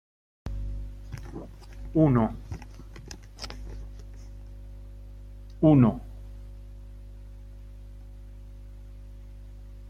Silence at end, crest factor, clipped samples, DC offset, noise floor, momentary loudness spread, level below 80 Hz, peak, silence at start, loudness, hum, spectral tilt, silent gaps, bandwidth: 0 s; 22 dB; under 0.1%; under 0.1%; -44 dBFS; 25 LU; -42 dBFS; -8 dBFS; 0.45 s; -26 LUFS; 50 Hz at -40 dBFS; -9 dB/octave; none; 11.5 kHz